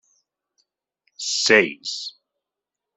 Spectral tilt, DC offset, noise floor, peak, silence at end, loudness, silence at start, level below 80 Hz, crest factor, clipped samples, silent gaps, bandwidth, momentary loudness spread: -1.5 dB/octave; under 0.1%; -86 dBFS; -2 dBFS; 0.85 s; -20 LUFS; 1.2 s; -72 dBFS; 24 dB; under 0.1%; none; 8.4 kHz; 15 LU